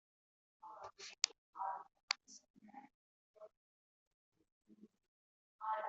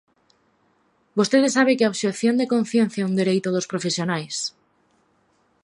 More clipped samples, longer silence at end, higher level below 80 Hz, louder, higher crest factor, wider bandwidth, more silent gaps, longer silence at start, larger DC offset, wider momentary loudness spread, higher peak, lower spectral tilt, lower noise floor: neither; second, 0 s vs 1.15 s; second, under -90 dBFS vs -72 dBFS; second, -44 LUFS vs -21 LUFS; first, 36 dB vs 18 dB; second, 8 kHz vs 11.5 kHz; first, 1.38-1.53 s, 2.03-2.08 s, 2.50-2.54 s, 2.94-3.34 s, 3.57-4.32 s, 4.52-4.61 s, 5.08-5.59 s vs none; second, 0.65 s vs 1.15 s; neither; first, 23 LU vs 8 LU; second, -14 dBFS vs -4 dBFS; second, 2.5 dB/octave vs -4.5 dB/octave; first, under -90 dBFS vs -64 dBFS